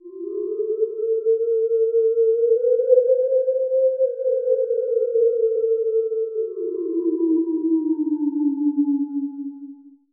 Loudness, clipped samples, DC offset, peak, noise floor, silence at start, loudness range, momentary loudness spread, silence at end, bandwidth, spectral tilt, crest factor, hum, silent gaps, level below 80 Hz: -21 LUFS; under 0.1%; under 0.1%; -4 dBFS; -41 dBFS; 0.05 s; 3 LU; 8 LU; 0.25 s; 1.5 kHz; -12 dB/octave; 16 dB; none; none; under -90 dBFS